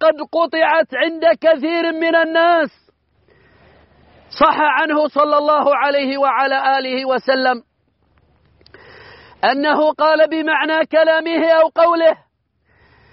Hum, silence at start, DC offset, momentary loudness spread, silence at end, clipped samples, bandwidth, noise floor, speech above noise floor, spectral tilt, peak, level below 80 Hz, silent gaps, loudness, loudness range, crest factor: none; 0 s; under 0.1%; 5 LU; 1 s; under 0.1%; 5.8 kHz; -62 dBFS; 47 dB; 0 dB/octave; -2 dBFS; -60 dBFS; none; -15 LUFS; 4 LU; 14 dB